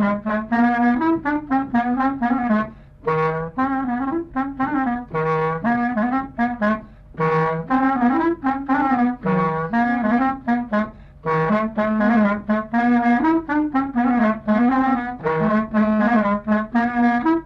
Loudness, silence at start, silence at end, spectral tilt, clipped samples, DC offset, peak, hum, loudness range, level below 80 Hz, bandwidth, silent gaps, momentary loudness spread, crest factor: -20 LUFS; 0 s; 0 s; -9 dB/octave; under 0.1%; under 0.1%; -8 dBFS; none; 3 LU; -46 dBFS; 5.8 kHz; none; 6 LU; 12 dB